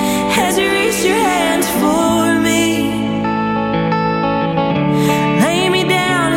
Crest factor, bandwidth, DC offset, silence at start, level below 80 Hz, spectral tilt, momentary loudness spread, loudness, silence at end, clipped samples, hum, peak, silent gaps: 10 dB; 17 kHz; under 0.1%; 0 s; -42 dBFS; -4.5 dB/octave; 4 LU; -14 LUFS; 0 s; under 0.1%; none; -4 dBFS; none